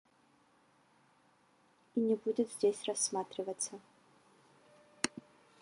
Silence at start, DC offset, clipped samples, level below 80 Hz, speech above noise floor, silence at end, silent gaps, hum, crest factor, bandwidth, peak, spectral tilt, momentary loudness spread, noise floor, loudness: 1.95 s; under 0.1%; under 0.1%; -82 dBFS; 35 dB; 0.4 s; none; none; 28 dB; 11.5 kHz; -10 dBFS; -3 dB/octave; 8 LU; -70 dBFS; -36 LUFS